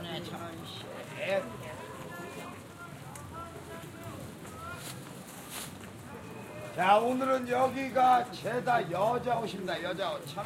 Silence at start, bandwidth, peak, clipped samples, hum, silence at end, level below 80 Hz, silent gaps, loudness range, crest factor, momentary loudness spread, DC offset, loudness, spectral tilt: 0 s; 16.5 kHz; -12 dBFS; under 0.1%; none; 0 s; -64 dBFS; none; 15 LU; 22 dB; 19 LU; under 0.1%; -31 LUFS; -4.5 dB/octave